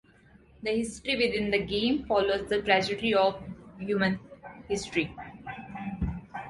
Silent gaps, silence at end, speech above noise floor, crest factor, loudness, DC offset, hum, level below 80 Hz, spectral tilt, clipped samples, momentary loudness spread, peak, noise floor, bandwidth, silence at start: none; 0 s; 30 dB; 20 dB; -28 LUFS; under 0.1%; none; -48 dBFS; -5 dB/octave; under 0.1%; 16 LU; -8 dBFS; -57 dBFS; 11.5 kHz; 0.6 s